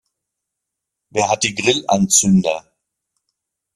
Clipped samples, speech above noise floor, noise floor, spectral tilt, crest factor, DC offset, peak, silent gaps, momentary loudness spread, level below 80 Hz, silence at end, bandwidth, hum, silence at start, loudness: under 0.1%; 65 dB; -81 dBFS; -3.5 dB/octave; 20 dB; under 0.1%; 0 dBFS; none; 11 LU; -56 dBFS; 1.15 s; 13.5 kHz; none; 1.15 s; -16 LUFS